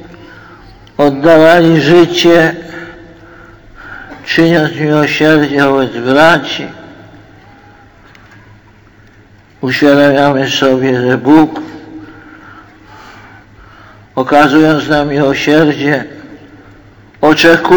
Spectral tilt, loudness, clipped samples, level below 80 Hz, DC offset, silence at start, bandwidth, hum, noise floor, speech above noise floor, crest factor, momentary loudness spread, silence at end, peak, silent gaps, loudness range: -5.5 dB/octave; -9 LUFS; 0.5%; -44 dBFS; under 0.1%; 0 s; 20 kHz; none; -42 dBFS; 33 dB; 12 dB; 20 LU; 0 s; 0 dBFS; none; 6 LU